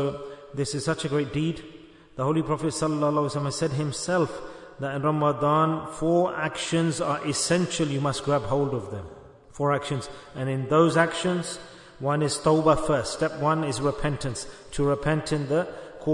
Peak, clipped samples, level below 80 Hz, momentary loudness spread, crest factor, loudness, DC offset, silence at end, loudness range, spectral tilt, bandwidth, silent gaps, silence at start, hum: -6 dBFS; under 0.1%; -50 dBFS; 13 LU; 18 dB; -26 LUFS; under 0.1%; 0 s; 3 LU; -5.5 dB/octave; 11 kHz; none; 0 s; none